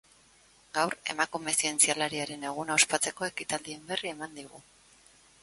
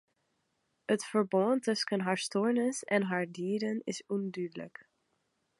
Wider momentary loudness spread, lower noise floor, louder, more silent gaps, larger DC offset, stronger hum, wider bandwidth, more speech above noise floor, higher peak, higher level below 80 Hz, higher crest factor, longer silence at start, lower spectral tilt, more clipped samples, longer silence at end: first, 14 LU vs 10 LU; second, -61 dBFS vs -79 dBFS; first, -29 LUFS vs -32 LUFS; neither; neither; neither; about the same, 12 kHz vs 11.5 kHz; second, 30 dB vs 47 dB; first, -8 dBFS vs -14 dBFS; first, -70 dBFS vs -84 dBFS; first, 26 dB vs 20 dB; second, 0.75 s vs 0.9 s; second, -1 dB/octave vs -5 dB/octave; neither; about the same, 0.8 s vs 0.9 s